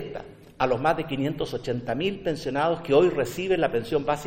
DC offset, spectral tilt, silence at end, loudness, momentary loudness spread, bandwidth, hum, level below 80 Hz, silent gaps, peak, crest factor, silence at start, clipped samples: under 0.1%; -6 dB/octave; 0 s; -25 LUFS; 9 LU; 16.5 kHz; none; -50 dBFS; none; -8 dBFS; 18 dB; 0 s; under 0.1%